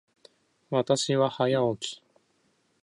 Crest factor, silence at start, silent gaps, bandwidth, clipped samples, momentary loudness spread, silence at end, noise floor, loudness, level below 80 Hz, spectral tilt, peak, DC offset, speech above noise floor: 20 dB; 0.7 s; none; 11.5 kHz; under 0.1%; 11 LU; 0.9 s; -70 dBFS; -27 LUFS; -72 dBFS; -5 dB/octave; -10 dBFS; under 0.1%; 44 dB